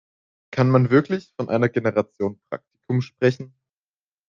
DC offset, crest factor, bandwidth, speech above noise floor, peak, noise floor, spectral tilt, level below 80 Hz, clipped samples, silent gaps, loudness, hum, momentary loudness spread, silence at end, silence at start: under 0.1%; 18 dB; 7 kHz; over 69 dB; -4 dBFS; under -90 dBFS; -8.5 dB/octave; -62 dBFS; under 0.1%; none; -22 LUFS; none; 17 LU; 0.8 s; 0.5 s